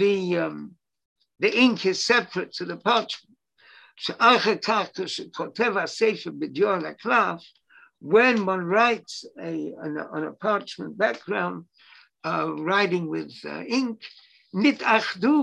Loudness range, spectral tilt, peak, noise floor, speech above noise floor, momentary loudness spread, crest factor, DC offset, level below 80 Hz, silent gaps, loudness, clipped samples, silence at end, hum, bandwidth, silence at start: 4 LU; -4.5 dB/octave; -4 dBFS; -56 dBFS; 32 dB; 15 LU; 20 dB; under 0.1%; -74 dBFS; 1.05-1.16 s; -24 LUFS; under 0.1%; 0 s; none; 10.5 kHz; 0 s